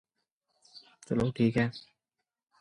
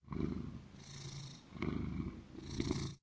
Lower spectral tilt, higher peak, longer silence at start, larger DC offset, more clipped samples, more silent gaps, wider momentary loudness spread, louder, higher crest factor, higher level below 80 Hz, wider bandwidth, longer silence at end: first, -7.5 dB/octave vs -6 dB/octave; first, -14 dBFS vs -22 dBFS; first, 0.75 s vs 0.05 s; neither; neither; neither; first, 21 LU vs 11 LU; first, -30 LUFS vs -44 LUFS; about the same, 20 dB vs 20 dB; second, -60 dBFS vs -52 dBFS; first, 11 kHz vs 8 kHz; first, 0.8 s vs 0.05 s